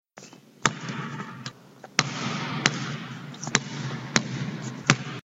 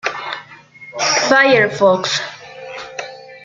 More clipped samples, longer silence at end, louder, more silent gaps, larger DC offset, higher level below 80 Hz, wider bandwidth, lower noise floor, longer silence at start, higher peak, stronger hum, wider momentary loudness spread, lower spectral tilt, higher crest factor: neither; about the same, 0.05 s vs 0.05 s; second, -28 LUFS vs -14 LUFS; neither; neither; about the same, -60 dBFS vs -62 dBFS; about the same, 9 kHz vs 8.8 kHz; first, -49 dBFS vs -40 dBFS; about the same, 0.15 s vs 0.05 s; about the same, 0 dBFS vs 0 dBFS; neither; second, 16 LU vs 21 LU; about the same, -3 dB/octave vs -2.5 dB/octave; first, 30 dB vs 16 dB